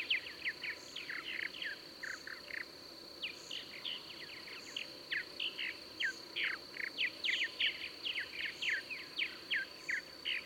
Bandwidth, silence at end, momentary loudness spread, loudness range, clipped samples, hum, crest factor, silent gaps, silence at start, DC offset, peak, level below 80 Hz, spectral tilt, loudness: 19 kHz; 0 s; 9 LU; 7 LU; under 0.1%; none; 20 dB; none; 0 s; under 0.1%; -22 dBFS; -76 dBFS; -0.5 dB/octave; -39 LUFS